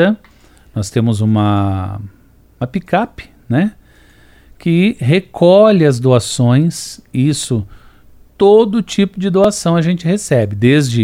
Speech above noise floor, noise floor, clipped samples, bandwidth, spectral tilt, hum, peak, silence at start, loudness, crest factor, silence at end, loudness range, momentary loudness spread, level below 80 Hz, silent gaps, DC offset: 33 dB; -45 dBFS; under 0.1%; 16 kHz; -6.5 dB/octave; none; 0 dBFS; 0 s; -14 LUFS; 14 dB; 0 s; 6 LU; 13 LU; -46 dBFS; none; under 0.1%